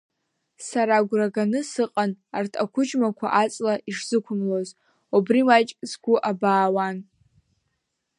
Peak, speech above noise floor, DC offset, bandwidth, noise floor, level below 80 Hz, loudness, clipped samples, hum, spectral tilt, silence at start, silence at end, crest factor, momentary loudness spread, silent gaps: -4 dBFS; 55 dB; under 0.1%; 11 kHz; -77 dBFS; -76 dBFS; -23 LUFS; under 0.1%; none; -5 dB/octave; 0.6 s; 1.15 s; 20 dB; 10 LU; none